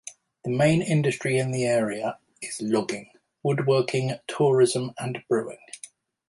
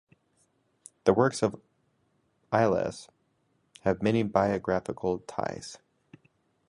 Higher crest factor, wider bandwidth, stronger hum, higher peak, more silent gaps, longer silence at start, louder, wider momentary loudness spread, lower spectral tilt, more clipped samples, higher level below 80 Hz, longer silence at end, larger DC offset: second, 16 dB vs 24 dB; about the same, 11.5 kHz vs 11.5 kHz; neither; about the same, -8 dBFS vs -6 dBFS; neither; second, 0.05 s vs 1.05 s; first, -25 LUFS vs -28 LUFS; first, 17 LU vs 11 LU; about the same, -5.5 dB/octave vs -6 dB/octave; neither; about the same, -62 dBFS vs -58 dBFS; second, 0.45 s vs 0.9 s; neither